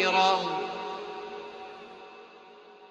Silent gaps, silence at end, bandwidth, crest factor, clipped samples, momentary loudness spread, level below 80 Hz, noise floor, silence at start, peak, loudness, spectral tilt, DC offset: none; 0 s; 8.6 kHz; 20 dB; under 0.1%; 27 LU; -74 dBFS; -51 dBFS; 0 s; -10 dBFS; -29 LUFS; -3 dB/octave; under 0.1%